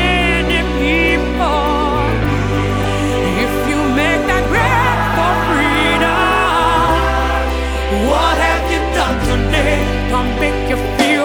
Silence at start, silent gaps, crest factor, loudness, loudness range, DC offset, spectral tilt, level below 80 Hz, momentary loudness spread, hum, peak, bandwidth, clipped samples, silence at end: 0 s; none; 14 dB; -14 LUFS; 2 LU; under 0.1%; -5 dB/octave; -22 dBFS; 4 LU; none; 0 dBFS; 20 kHz; under 0.1%; 0 s